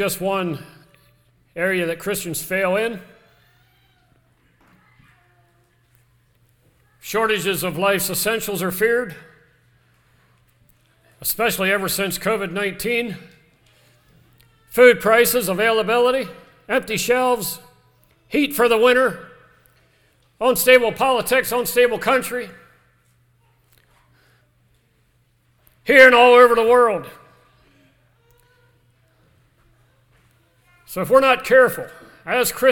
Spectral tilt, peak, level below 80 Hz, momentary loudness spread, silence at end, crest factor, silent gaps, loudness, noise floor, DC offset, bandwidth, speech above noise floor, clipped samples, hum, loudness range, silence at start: -3 dB/octave; 0 dBFS; -54 dBFS; 17 LU; 0 s; 20 dB; none; -17 LUFS; -61 dBFS; under 0.1%; 19 kHz; 44 dB; under 0.1%; none; 11 LU; 0 s